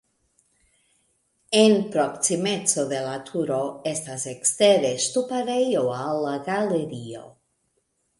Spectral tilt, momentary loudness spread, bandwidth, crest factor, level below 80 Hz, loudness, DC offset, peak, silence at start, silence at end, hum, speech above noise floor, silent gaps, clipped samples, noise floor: -3.5 dB/octave; 11 LU; 11.5 kHz; 20 dB; -68 dBFS; -23 LUFS; under 0.1%; -4 dBFS; 1.5 s; 0.9 s; none; 49 dB; none; under 0.1%; -72 dBFS